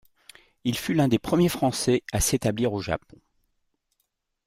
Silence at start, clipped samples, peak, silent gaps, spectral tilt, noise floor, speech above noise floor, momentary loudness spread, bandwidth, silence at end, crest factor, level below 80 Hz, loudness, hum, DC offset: 0.65 s; under 0.1%; -10 dBFS; none; -5 dB/octave; -77 dBFS; 53 dB; 8 LU; 16 kHz; 1.5 s; 18 dB; -46 dBFS; -25 LUFS; none; under 0.1%